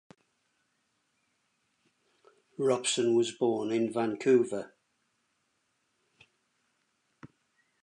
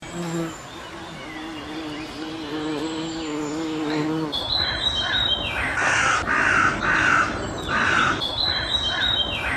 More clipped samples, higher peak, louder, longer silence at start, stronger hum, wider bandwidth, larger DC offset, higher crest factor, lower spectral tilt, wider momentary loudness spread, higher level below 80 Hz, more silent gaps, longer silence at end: neither; second, -14 dBFS vs -6 dBFS; second, -29 LUFS vs -22 LUFS; first, 2.6 s vs 0 s; neither; second, 11 kHz vs 14.5 kHz; neither; about the same, 20 dB vs 18 dB; about the same, -4 dB/octave vs -3 dB/octave; about the same, 12 LU vs 14 LU; second, -82 dBFS vs -42 dBFS; neither; first, 0.6 s vs 0 s